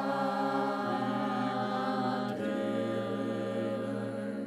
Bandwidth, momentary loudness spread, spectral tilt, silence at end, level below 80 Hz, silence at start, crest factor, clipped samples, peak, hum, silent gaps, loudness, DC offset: 13 kHz; 3 LU; -7 dB/octave; 0 s; -86 dBFS; 0 s; 14 dB; under 0.1%; -18 dBFS; none; none; -33 LUFS; under 0.1%